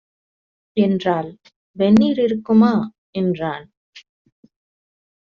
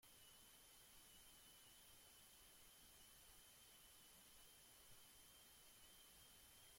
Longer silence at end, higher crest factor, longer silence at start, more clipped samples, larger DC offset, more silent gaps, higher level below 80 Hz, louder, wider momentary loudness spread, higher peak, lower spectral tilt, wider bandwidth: first, 1.25 s vs 0 s; about the same, 16 dB vs 14 dB; first, 0.75 s vs 0 s; neither; neither; first, 1.56-1.74 s, 2.98-3.13 s, 3.77-3.93 s vs none; first, -58 dBFS vs -80 dBFS; first, -18 LUFS vs -65 LUFS; first, 13 LU vs 1 LU; first, -4 dBFS vs -54 dBFS; first, -6.5 dB/octave vs -1 dB/octave; second, 7 kHz vs 16.5 kHz